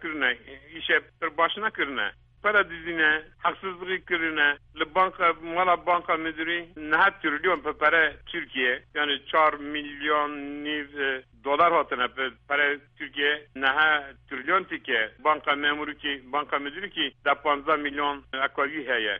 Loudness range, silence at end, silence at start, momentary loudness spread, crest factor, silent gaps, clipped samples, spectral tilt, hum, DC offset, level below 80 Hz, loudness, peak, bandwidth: 2 LU; 0 s; 0 s; 9 LU; 18 dB; none; under 0.1%; -6 dB/octave; none; under 0.1%; -58 dBFS; -25 LUFS; -8 dBFS; 5.8 kHz